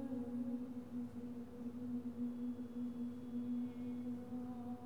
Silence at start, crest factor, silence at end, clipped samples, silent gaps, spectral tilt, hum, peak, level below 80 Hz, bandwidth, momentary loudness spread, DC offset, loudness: 0 s; 10 dB; 0 s; under 0.1%; none; -8.5 dB/octave; none; -34 dBFS; -72 dBFS; 12 kHz; 4 LU; 0.1%; -45 LUFS